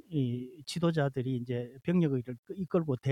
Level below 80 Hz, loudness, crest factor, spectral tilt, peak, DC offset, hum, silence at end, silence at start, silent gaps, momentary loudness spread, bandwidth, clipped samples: -66 dBFS; -33 LUFS; 14 dB; -7.5 dB/octave; -16 dBFS; under 0.1%; none; 0 s; 0.1 s; 2.39-2.43 s; 10 LU; 11.5 kHz; under 0.1%